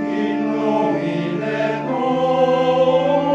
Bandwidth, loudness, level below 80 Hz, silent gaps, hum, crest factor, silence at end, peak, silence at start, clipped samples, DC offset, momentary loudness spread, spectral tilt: 7.8 kHz; -18 LUFS; -58 dBFS; none; none; 14 dB; 0 s; -4 dBFS; 0 s; under 0.1%; under 0.1%; 5 LU; -7 dB/octave